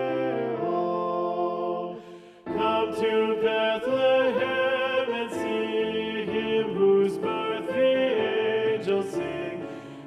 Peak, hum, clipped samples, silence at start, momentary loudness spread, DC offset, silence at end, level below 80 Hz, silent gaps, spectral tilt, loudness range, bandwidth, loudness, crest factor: -12 dBFS; none; under 0.1%; 0 s; 10 LU; under 0.1%; 0 s; -64 dBFS; none; -6 dB/octave; 2 LU; 12 kHz; -26 LUFS; 14 dB